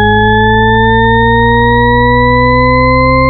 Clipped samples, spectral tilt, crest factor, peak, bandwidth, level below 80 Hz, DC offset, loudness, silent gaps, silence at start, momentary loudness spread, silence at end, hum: under 0.1%; -4.5 dB/octave; 6 dB; 0 dBFS; 4.4 kHz; -18 dBFS; under 0.1%; -8 LUFS; none; 0 s; 0 LU; 0 s; none